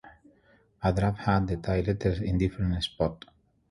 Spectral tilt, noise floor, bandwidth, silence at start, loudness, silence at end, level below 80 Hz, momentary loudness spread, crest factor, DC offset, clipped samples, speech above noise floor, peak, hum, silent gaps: -7.5 dB/octave; -63 dBFS; 11.5 kHz; 0.05 s; -28 LUFS; 0.55 s; -40 dBFS; 5 LU; 18 dB; under 0.1%; under 0.1%; 36 dB; -10 dBFS; none; none